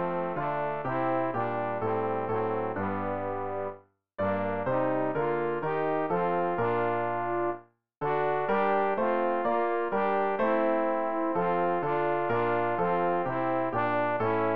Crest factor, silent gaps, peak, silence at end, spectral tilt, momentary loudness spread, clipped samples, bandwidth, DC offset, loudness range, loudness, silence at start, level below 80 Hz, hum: 14 dB; 7.97-8.01 s; -14 dBFS; 0 s; -5.5 dB/octave; 5 LU; under 0.1%; 5.2 kHz; 0.6%; 4 LU; -29 LUFS; 0 s; -64 dBFS; none